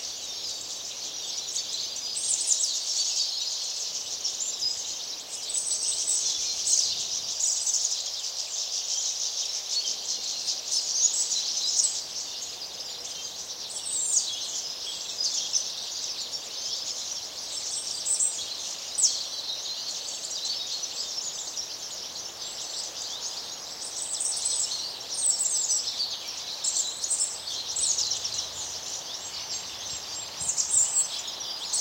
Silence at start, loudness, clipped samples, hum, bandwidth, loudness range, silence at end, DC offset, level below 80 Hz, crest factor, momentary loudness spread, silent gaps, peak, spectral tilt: 0 s; -27 LUFS; under 0.1%; none; 16 kHz; 5 LU; 0 s; under 0.1%; -68 dBFS; 22 dB; 10 LU; none; -8 dBFS; 2.5 dB/octave